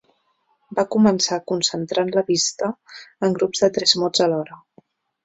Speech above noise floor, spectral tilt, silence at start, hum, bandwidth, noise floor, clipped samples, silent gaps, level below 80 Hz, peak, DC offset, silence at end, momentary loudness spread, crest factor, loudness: 46 dB; -3.5 dB/octave; 0.7 s; none; 8.2 kHz; -66 dBFS; under 0.1%; none; -64 dBFS; -2 dBFS; under 0.1%; 0.7 s; 11 LU; 20 dB; -20 LUFS